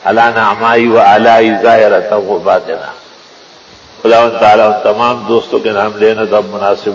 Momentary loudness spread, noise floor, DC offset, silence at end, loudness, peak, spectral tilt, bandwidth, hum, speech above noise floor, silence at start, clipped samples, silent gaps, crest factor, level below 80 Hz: 7 LU; -37 dBFS; under 0.1%; 0 s; -9 LUFS; 0 dBFS; -5.5 dB/octave; 8 kHz; none; 29 dB; 0.05 s; 0.9%; none; 10 dB; -52 dBFS